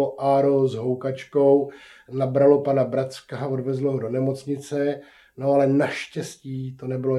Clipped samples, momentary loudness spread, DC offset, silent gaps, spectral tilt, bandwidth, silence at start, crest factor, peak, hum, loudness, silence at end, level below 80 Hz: under 0.1%; 14 LU; under 0.1%; none; -7.5 dB/octave; 12 kHz; 0 s; 18 dB; -4 dBFS; none; -23 LUFS; 0 s; -70 dBFS